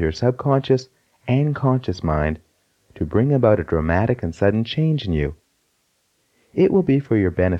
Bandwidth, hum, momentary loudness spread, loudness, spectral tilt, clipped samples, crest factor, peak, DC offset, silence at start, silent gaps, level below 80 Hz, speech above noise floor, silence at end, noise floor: 7.8 kHz; none; 7 LU; -20 LUFS; -8.5 dB/octave; under 0.1%; 18 dB; -2 dBFS; under 0.1%; 0 s; none; -38 dBFS; 48 dB; 0 s; -67 dBFS